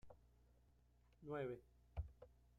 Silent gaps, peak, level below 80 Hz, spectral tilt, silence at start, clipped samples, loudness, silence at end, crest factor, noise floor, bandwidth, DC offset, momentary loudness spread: none; -36 dBFS; -62 dBFS; -8.5 dB/octave; 0.05 s; under 0.1%; -53 LUFS; 0 s; 20 dB; -74 dBFS; 10.5 kHz; under 0.1%; 13 LU